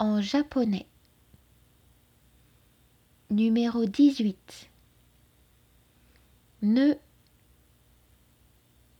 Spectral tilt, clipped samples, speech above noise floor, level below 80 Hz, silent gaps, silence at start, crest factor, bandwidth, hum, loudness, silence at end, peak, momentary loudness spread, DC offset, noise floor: -6.5 dB/octave; under 0.1%; 38 dB; -64 dBFS; none; 0 s; 18 dB; 10.5 kHz; 60 Hz at -55 dBFS; -26 LUFS; 2 s; -10 dBFS; 13 LU; under 0.1%; -63 dBFS